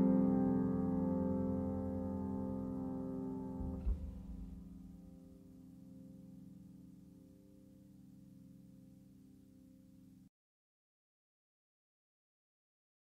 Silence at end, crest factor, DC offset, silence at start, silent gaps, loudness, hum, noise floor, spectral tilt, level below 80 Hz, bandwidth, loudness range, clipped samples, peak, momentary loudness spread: 2.85 s; 20 dB; under 0.1%; 0 s; none; -39 LUFS; none; -62 dBFS; -11 dB/octave; -54 dBFS; 2.5 kHz; 23 LU; under 0.1%; -22 dBFS; 26 LU